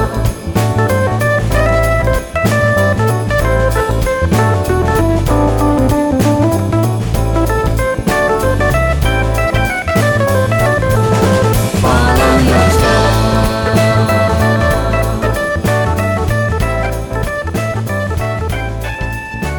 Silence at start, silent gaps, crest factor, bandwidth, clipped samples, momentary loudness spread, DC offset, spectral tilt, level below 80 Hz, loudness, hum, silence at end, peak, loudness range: 0 s; none; 12 dB; 19.5 kHz; under 0.1%; 7 LU; under 0.1%; -6 dB/octave; -20 dBFS; -13 LUFS; none; 0 s; -2 dBFS; 4 LU